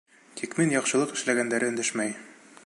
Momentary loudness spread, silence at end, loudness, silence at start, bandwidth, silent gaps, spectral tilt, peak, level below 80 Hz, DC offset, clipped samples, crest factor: 13 LU; 0.35 s; -26 LUFS; 0.35 s; 11.5 kHz; none; -3.5 dB/octave; -10 dBFS; -78 dBFS; under 0.1%; under 0.1%; 18 dB